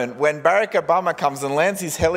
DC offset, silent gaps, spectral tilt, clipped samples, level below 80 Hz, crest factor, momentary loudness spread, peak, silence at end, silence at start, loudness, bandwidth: under 0.1%; none; -4 dB/octave; under 0.1%; -46 dBFS; 18 dB; 4 LU; -2 dBFS; 0 s; 0 s; -20 LUFS; 16 kHz